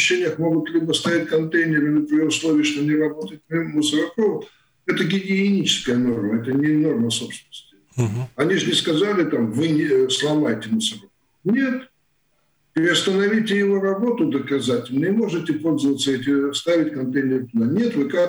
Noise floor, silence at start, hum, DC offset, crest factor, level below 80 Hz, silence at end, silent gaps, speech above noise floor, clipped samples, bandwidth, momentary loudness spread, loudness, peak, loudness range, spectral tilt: -67 dBFS; 0 s; none; under 0.1%; 12 dB; -64 dBFS; 0 s; none; 48 dB; under 0.1%; over 20 kHz; 7 LU; -20 LUFS; -8 dBFS; 2 LU; -4.5 dB/octave